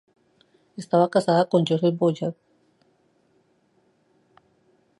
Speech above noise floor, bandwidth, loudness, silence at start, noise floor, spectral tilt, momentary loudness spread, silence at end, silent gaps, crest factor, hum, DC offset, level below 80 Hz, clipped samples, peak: 44 dB; 11.5 kHz; -22 LUFS; 0.8 s; -65 dBFS; -7 dB/octave; 14 LU; 2.65 s; none; 20 dB; none; under 0.1%; -74 dBFS; under 0.1%; -6 dBFS